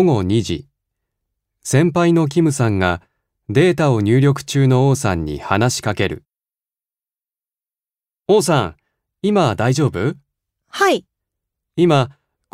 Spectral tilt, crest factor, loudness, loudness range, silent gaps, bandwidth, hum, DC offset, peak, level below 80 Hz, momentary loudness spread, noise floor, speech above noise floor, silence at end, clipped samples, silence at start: -6 dB/octave; 18 dB; -17 LUFS; 6 LU; none; 15.5 kHz; none; under 0.1%; 0 dBFS; -46 dBFS; 12 LU; under -90 dBFS; over 75 dB; 0.45 s; under 0.1%; 0 s